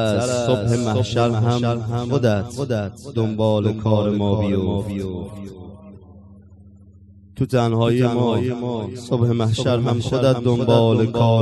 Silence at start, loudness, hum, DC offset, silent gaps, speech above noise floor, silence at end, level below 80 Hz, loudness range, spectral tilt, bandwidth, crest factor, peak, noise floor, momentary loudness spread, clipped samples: 0 s; -20 LUFS; none; under 0.1%; none; 27 dB; 0 s; -42 dBFS; 6 LU; -7 dB/octave; 12 kHz; 18 dB; -2 dBFS; -46 dBFS; 10 LU; under 0.1%